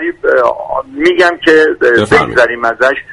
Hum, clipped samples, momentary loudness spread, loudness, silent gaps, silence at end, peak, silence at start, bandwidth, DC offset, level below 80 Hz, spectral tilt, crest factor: none; 0.3%; 5 LU; -10 LUFS; none; 0 s; 0 dBFS; 0 s; 11.5 kHz; under 0.1%; -42 dBFS; -5 dB/octave; 10 dB